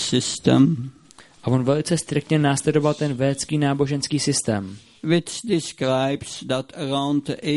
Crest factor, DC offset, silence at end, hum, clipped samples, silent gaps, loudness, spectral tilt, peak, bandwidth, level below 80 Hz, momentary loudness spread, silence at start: 20 dB; under 0.1%; 0 s; none; under 0.1%; none; -22 LUFS; -5 dB/octave; -2 dBFS; 11.5 kHz; -56 dBFS; 8 LU; 0 s